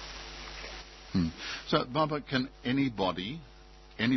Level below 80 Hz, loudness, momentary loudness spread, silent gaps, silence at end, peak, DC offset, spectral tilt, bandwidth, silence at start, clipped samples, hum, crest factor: -52 dBFS; -32 LUFS; 13 LU; none; 0 s; -14 dBFS; under 0.1%; -6 dB/octave; 6.2 kHz; 0 s; under 0.1%; none; 20 dB